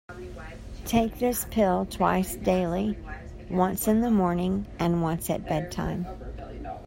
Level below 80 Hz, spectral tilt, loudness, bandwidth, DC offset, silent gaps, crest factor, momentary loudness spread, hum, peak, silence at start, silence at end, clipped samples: -42 dBFS; -6 dB/octave; -27 LUFS; 16.5 kHz; under 0.1%; none; 18 dB; 16 LU; none; -8 dBFS; 0.1 s; 0 s; under 0.1%